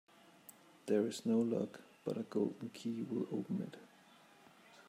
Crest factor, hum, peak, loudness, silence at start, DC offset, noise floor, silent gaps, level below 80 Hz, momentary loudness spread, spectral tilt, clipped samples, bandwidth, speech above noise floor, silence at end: 18 dB; none; -22 dBFS; -39 LUFS; 0.5 s; under 0.1%; -64 dBFS; none; -88 dBFS; 23 LU; -6.5 dB/octave; under 0.1%; 16 kHz; 26 dB; 0.05 s